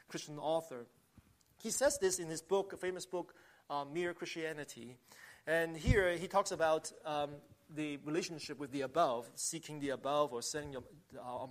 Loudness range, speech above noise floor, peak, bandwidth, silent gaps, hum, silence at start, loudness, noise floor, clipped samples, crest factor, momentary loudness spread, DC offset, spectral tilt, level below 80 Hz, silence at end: 4 LU; 29 dB; -18 dBFS; 15 kHz; none; none; 0.1 s; -38 LUFS; -67 dBFS; under 0.1%; 22 dB; 17 LU; under 0.1%; -4 dB/octave; -54 dBFS; 0 s